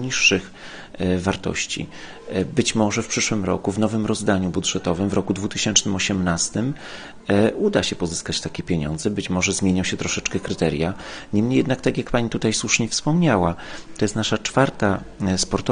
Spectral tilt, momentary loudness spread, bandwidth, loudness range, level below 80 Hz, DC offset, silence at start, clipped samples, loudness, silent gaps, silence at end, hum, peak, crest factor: -4 dB/octave; 8 LU; 10 kHz; 2 LU; -44 dBFS; under 0.1%; 0 s; under 0.1%; -21 LUFS; none; 0 s; none; -2 dBFS; 20 dB